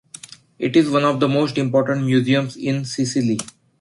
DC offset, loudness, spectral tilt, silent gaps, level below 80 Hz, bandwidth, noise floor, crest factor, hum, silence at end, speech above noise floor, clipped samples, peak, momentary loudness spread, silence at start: under 0.1%; -19 LUFS; -6 dB/octave; none; -60 dBFS; 11.5 kHz; -42 dBFS; 16 dB; none; 0.3 s; 23 dB; under 0.1%; -4 dBFS; 10 LU; 0.6 s